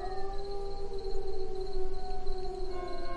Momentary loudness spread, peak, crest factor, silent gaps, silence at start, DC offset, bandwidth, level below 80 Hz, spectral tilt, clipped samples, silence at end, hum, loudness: 1 LU; -18 dBFS; 10 dB; none; 0 s; under 0.1%; 4.9 kHz; -36 dBFS; -6.5 dB/octave; under 0.1%; 0 s; none; -40 LUFS